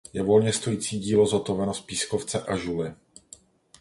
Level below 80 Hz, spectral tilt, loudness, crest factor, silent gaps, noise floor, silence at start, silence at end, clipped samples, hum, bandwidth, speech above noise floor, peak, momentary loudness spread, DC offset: -54 dBFS; -5 dB/octave; -25 LUFS; 18 dB; none; -53 dBFS; 0.15 s; 0.85 s; under 0.1%; none; 11.5 kHz; 28 dB; -8 dBFS; 8 LU; under 0.1%